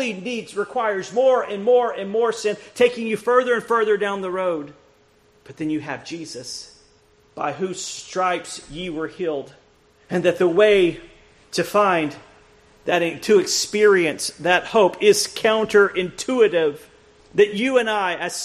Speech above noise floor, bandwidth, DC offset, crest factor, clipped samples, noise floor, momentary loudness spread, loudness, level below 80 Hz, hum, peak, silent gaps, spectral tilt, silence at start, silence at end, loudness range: 37 dB; 14 kHz; under 0.1%; 18 dB; under 0.1%; -57 dBFS; 14 LU; -20 LUFS; -58 dBFS; none; -2 dBFS; none; -3.5 dB/octave; 0 s; 0 s; 10 LU